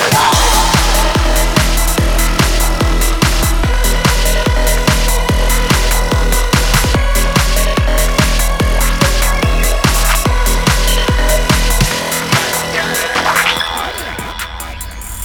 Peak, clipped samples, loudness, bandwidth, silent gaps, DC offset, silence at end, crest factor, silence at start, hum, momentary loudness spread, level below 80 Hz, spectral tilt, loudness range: 0 dBFS; under 0.1%; -13 LUFS; 19 kHz; none; under 0.1%; 0 s; 12 dB; 0 s; none; 4 LU; -14 dBFS; -3.5 dB/octave; 1 LU